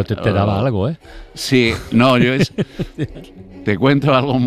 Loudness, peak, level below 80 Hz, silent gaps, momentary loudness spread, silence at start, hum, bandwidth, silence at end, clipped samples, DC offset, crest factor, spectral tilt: -16 LUFS; -2 dBFS; -40 dBFS; none; 13 LU; 0 s; none; 15 kHz; 0 s; under 0.1%; under 0.1%; 14 dB; -6.5 dB/octave